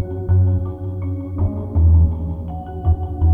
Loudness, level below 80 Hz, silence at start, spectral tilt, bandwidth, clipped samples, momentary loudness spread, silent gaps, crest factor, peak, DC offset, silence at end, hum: -20 LUFS; -22 dBFS; 0 s; -12.5 dB/octave; 2.3 kHz; under 0.1%; 12 LU; none; 12 dB; -6 dBFS; under 0.1%; 0 s; none